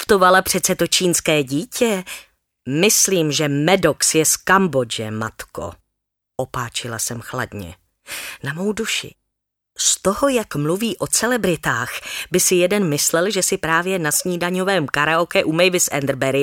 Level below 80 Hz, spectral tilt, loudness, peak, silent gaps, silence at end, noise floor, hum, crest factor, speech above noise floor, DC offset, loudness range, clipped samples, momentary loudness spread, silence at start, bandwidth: -50 dBFS; -3 dB/octave; -18 LUFS; -2 dBFS; none; 0 s; -79 dBFS; none; 18 dB; 60 dB; under 0.1%; 9 LU; under 0.1%; 14 LU; 0 s; 17.5 kHz